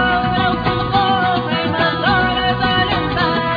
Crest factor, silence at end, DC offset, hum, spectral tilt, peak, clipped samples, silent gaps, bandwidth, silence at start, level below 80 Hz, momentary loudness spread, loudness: 14 dB; 0 s; under 0.1%; none; -7.5 dB/octave; -2 dBFS; under 0.1%; none; 5 kHz; 0 s; -34 dBFS; 2 LU; -16 LUFS